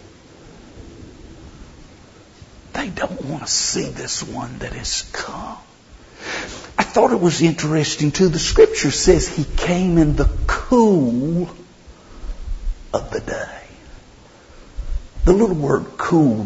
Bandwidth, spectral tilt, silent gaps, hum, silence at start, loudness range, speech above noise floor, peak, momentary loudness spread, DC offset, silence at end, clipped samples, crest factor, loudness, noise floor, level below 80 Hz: 8 kHz; -5 dB/octave; none; none; 0 s; 14 LU; 28 dB; -2 dBFS; 18 LU; under 0.1%; 0 s; under 0.1%; 18 dB; -19 LUFS; -46 dBFS; -30 dBFS